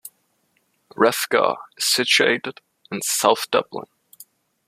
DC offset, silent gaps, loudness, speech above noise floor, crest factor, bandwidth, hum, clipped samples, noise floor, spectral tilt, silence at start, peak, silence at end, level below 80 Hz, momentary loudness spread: under 0.1%; none; -19 LUFS; 47 dB; 22 dB; 15 kHz; none; under 0.1%; -67 dBFS; -1.5 dB/octave; 0.05 s; -2 dBFS; 0.85 s; -70 dBFS; 17 LU